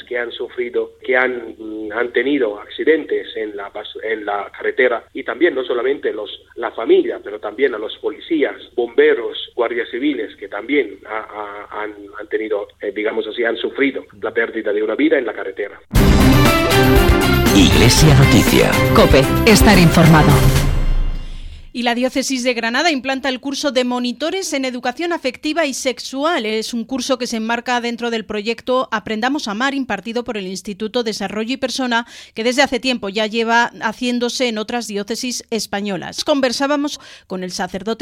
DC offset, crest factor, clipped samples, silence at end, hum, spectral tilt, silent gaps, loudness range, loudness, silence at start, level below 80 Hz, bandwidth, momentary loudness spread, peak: under 0.1%; 16 dB; under 0.1%; 0.05 s; none; -5 dB/octave; none; 9 LU; -17 LUFS; 0.1 s; -26 dBFS; 16.5 kHz; 15 LU; 0 dBFS